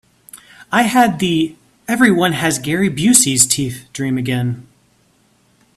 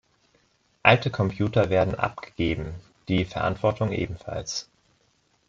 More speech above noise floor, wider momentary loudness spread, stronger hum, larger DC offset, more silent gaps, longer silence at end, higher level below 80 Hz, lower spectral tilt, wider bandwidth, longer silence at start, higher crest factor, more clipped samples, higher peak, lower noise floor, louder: about the same, 41 dB vs 42 dB; about the same, 13 LU vs 13 LU; neither; neither; neither; first, 1.15 s vs 0.85 s; about the same, -52 dBFS vs -48 dBFS; second, -3.5 dB/octave vs -5.5 dB/octave; first, 16 kHz vs 7.6 kHz; second, 0.35 s vs 0.85 s; second, 16 dB vs 24 dB; neither; about the same, 0 dBFS vs -2 dBFS; second, -56 dBFS vs -67 dBFS; first, -15 LUFS vs -25 LUFS